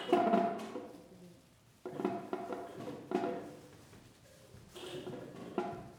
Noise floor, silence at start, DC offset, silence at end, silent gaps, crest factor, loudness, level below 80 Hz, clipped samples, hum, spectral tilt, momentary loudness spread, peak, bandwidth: -64 dBFS; 0 s; under 0.1%; 0 s; none; 24 dB; -38 LUFS; -72 dBFS; under 0.1%; none; -6 dB/octave; 25 LU; -16 dBFS; 17.5 kHz